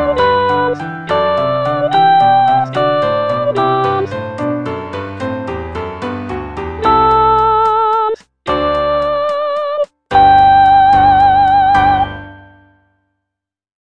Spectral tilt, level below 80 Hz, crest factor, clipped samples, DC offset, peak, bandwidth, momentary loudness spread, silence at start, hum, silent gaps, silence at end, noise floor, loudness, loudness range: -6.5 dB/octave; -36 dBFS; 12 dB; under 0.1%; 0.5%; 0 dBFS; 8.4 kHz; 14 LU; 0 s; none; none; 1.55 s; -81 dBFS; -13 LUFS; 7 LU